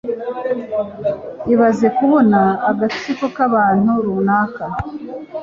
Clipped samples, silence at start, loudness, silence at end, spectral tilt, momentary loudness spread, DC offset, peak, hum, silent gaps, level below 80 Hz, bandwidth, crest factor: under 0.1%; 0.05 s; -16 LUFS; 0 s; -7.5 dB/octave; 12 LU; under 0.1%; -2 dBFS; none; none; -48 dBFS; 7.4 kHz; 14 dB